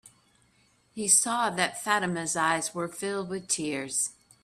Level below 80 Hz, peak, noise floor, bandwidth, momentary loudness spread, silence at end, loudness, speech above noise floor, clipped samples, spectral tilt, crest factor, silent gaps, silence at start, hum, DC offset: -70 dBFS; -8 dBFS; -66 dBFS; 15.5 kHz; 11 LU; 0.3 s; -27 LUFS; 37 dB; under 0.1%; -2 dB/octave; 22 dB; none; 0.05 s; none; under 0.1%